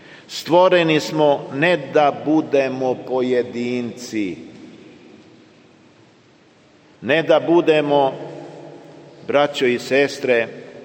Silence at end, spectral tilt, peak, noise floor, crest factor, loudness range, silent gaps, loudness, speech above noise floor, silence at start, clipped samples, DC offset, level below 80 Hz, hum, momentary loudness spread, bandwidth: 0 s; -5.5 dB/octave; -2 dBFS; -52 dBFS; 18 dB; 11 LU; none; -18 LUFS; 34 dB; 0.1 s; under 0.1%; under 0.1%; -68 dBFS; none; 18 LU; 16.5 kHz